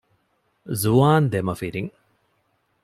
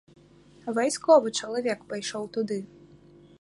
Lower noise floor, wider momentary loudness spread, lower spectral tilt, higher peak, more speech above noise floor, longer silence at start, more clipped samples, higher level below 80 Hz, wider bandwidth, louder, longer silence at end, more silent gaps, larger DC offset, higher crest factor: first, -68 dBFS vs -55 dBFS; about the same, 15 LU vs 14 LU; first, -6.5 dB/octave vs -3.5 dB/octave; about the same, -4 dBFS vs -6 dBFS; first, 48 dB vs 29 dB; about the same, 0.65 s vs 0.65 s; neither; first, -54 dBFS vs -70 dBFS; first, 15 kHz vs 11.5 kHz; first, -21 LUFS vs -26 LUFS; first, 0.95 s vs 0.75 s; neither; neither; about the same, 18 dB vs 22 dB